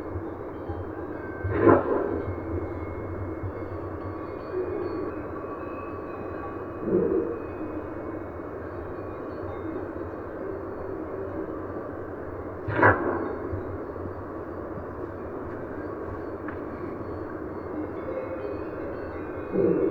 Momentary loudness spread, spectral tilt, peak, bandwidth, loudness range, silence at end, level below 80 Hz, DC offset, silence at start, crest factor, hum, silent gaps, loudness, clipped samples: 11 LU; -10 dB/octave; -4 dBFS; 4.9 kHz; 8 LU; 0 s; -48 dBFS; under 0.1%; 0 s; 26 dB; none; none; -31 LUFS; under 0.1%